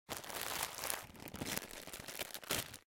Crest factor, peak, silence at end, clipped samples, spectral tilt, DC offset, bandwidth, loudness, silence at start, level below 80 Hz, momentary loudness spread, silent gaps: 30 dB; -14 dBFS; 0.1 s; under 0.1%; -1.5 dB/octave; under 0.1%; 17 kHz; -42 LUFS; 0.1 s; -66 dBFS; 8 LU; none